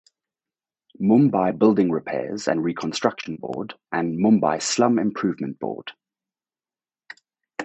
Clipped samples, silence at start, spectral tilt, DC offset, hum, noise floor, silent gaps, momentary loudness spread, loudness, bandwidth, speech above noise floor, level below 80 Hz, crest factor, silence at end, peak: under 0.1%; 1 s; -5.5 dB/octave; under 0.1%; none; under -90 dBFS; none; 13 LU; -22 LUFS; 8.4 kHz; over 69 dB; -64 dBFS; 22 dB; 0 s; -2 dBFS